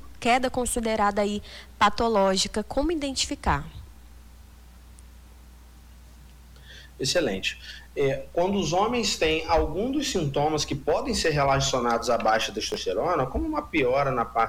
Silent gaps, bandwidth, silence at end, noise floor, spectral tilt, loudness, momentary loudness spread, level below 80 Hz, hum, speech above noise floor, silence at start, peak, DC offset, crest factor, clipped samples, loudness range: none; 19 kHz; 0 s; -48 dBFS; -4 dB/octave; -25 LUFS; 7 LU; -42 dBFS; none; 23 dB; 0 s; -10 dBFS; under 0.1%; 16 dB; under 0.1%; 8 LU